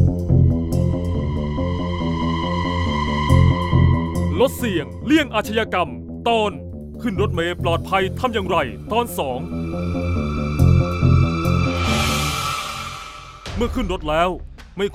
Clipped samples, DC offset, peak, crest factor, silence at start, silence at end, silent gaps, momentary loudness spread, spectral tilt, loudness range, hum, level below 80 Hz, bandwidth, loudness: under 0.1%; under 0.1%; -2 dBFS; 16 dB; 0 s; 0 s; none; 10 LU; -6 dB/octave; 3 LU; none; -30 dBFS; 15.5 kHz; -20 LUFS